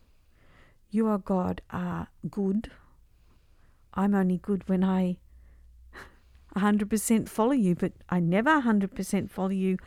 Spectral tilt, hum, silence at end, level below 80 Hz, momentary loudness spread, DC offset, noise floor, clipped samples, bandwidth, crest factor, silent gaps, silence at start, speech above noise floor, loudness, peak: -6.5 dB/octave; none; 0.05 s; -54 dBFS; 12 LU; under 0.1%; -59 dBFS; under 0.1%; 15.5 kHz; 18 dB; none; 0.95 s; 32 dB; -27 LUFS; -10 dBFS